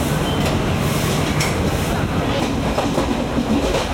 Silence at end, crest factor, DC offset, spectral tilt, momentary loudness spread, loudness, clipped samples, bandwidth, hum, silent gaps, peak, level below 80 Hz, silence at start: 0 s; 12 dB; under 0.1%; -5 dB/octave; 1 LU; -19 LUFS; under 0.1%; 16.5 kHz; none; none; -6 dBFS; -30 dBFS; 0 s